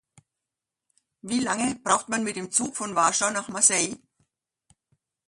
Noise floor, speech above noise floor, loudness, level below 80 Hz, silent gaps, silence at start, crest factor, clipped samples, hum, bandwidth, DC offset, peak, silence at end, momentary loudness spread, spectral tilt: -87 dBFS; 62 dB; -24 LUFS; -68 dBFS; none; 1.25 s; 24 dB; under 0.1%; none; 11.5 kHz; under 0.1%; -4 dBFS; 1.3 s; 10 LU; -2 dB/octave